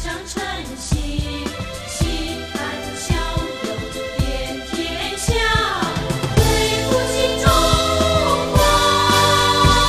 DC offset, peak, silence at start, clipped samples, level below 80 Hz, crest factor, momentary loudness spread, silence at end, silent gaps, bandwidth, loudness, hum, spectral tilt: under 0.1%; 0 dBFS; 0 s; under 0.1%; -28 dBFS; 18 dB; 12 LU; 0 s; none; 15.5 kHz; -18 LUFS; none; -4 dB/octave